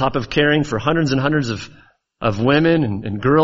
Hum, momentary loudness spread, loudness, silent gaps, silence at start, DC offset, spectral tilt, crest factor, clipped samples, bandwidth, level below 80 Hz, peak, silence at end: none; 9 LU; -18 LUFS; none; 0 s; under 0.1%; -5 dB/octave; 16 dB; under 0.1%; 7.8 kHz; -42 dBFS; -2 dBFS; 0 s